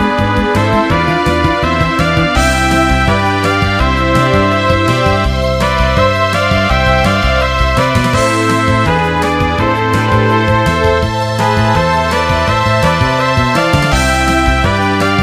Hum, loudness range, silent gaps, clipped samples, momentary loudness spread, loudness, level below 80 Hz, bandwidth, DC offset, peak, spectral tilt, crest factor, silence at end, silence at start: none; 1 LU; none; under 0.1%; 2 LU; -11 LUFS; -22 dBFS; 15.5 kHz; 0.6%; 0 dBFS; -5.5 dB/octave; 12 dB; 0 s; 0 s